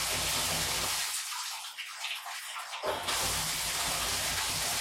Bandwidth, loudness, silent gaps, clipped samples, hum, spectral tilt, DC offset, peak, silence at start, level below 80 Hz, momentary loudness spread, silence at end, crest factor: 16.5 kHz; -31 LUFS; none; under 0.1%; none; -0.5 dB/octave; under 0.1%; -18 dBFS; 0 s; -54 dBFS; 9 LU; 0 s; 16 dB